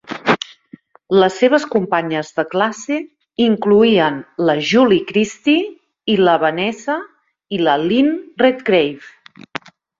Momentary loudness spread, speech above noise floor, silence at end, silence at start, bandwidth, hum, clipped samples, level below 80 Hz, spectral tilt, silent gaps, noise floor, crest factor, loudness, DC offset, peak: 13 LU; 29 dB; 0.9 s; 0.1 s; 7.8 kHz; none; under 0.1%; -58 dBFS; -5.5 dB/octave; none; -44 dBFS; 16 dB; -16 LUFS; under 0.1%; 0 dBFS